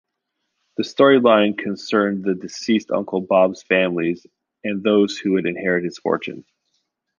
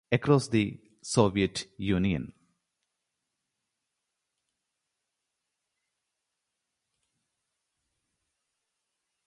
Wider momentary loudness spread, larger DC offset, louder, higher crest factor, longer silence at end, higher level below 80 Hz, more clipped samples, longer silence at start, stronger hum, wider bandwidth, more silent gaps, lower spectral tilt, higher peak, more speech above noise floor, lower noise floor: first, 13 LU vs 10 LU; neither; first, -19 LUFS vs -28 LUFS; second, 18 dB vs 26 dB; second, 0.8 s vs 6.95 s; second, -64 dBFS vs -56 dBFS; neither; first, 0.8 s vs 0.1 s; neither; second, 7.4 kHz vs 11 kHz; neither; about the same, -5.5 dB/octave vs -6 dB/octave; first, -2 dBFS vs -8 dBFS; about the same, 58 dB vs 58 dB; second, -77 dBFS vs -84 dBFS